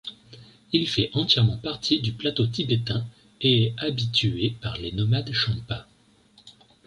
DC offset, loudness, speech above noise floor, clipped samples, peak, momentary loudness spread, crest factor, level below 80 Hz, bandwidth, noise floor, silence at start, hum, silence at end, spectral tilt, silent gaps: under 0.1%; -24 LUFS; 34 dB; under 0.1%; -8 dBFS; 10 LU; 18 dB; -50 dBFS; 11 kHz; -58 dBFS; 0.05 s; none; 0.35 s; -6 dB/octave; none